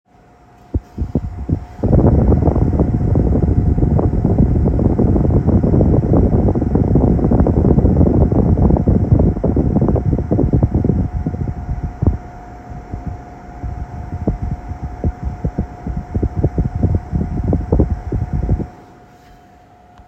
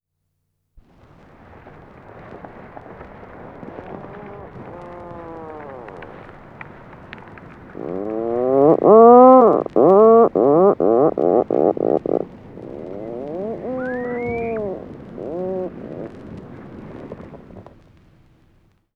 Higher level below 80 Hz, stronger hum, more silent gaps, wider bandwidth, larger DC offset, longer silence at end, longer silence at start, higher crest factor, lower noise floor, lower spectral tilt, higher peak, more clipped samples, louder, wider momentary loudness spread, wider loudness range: first, -22 dBFS vs -52 dBFS; neither; neither; first, 5.8 kHz vs 4.1 kHz; neither; about the same, 1.25 s vs 1.35 s; second, 0.75 s vs 2.15 s; about the same, 14 dB vs 18 dB; second, -46 dBFS vs -73 dBFS; first, -12 dB/octave vs -10.5 dB/octave; about the same, 0 dBFS vs 0 dBFS; neither; about the same, -16 LUFS vs -15 LUFS; second, 15 LU vs 28 LU; second, 11 LU vs 25 LU